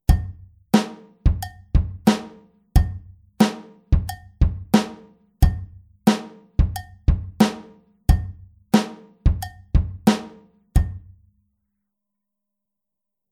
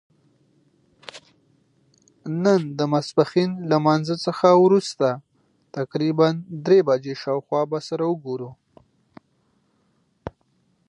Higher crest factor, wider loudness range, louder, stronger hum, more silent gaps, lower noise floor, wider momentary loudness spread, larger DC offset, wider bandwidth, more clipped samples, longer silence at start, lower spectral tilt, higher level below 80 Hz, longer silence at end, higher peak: about the same, 22 dB vs 20 dB; second, 3 LU vs 9 LU; about the same, -23 LUFS vs -21 LUFS; neither; neither; first, -85 dBFS vs -66 dBFS; second, 13 LU vs 22 LU; neither; first, 16 kHz vs 10.5 kHz; neither; second, 0.1 s vs 1.15 s; about the same, -6.5 dB/octave vs -7 dB/octave; first, -26 dBFS vs -62 dBFS; first, 2.35 s vs 0.6 s; about the same, -2 dBFS vs -4 dBFS